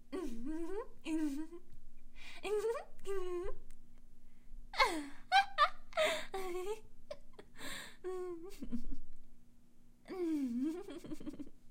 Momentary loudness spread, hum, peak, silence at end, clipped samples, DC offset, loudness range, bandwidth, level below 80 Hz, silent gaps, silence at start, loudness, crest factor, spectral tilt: 20 LU; none; -16 dBFS; 0 s; under 0.1%; under 0.1%; 11 LU; 15.5 kHz; -50 dBFS; none; 0 s; -39 LUFS; 22 dB; -3.5 dB/octave